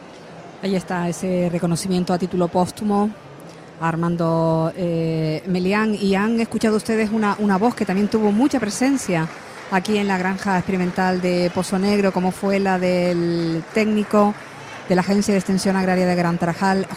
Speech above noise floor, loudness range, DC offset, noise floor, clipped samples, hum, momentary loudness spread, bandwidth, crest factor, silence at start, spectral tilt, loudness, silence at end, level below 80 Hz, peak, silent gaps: 20 dB; 3 LU; under 0.1%; -39 dBFS; under 0.1%; none; 6 LU; 15 kHz; 16 dB; 0 s; -6 dB/octave; -20 LUFS; 0 s; -52 dBFS; -4 dBFS; none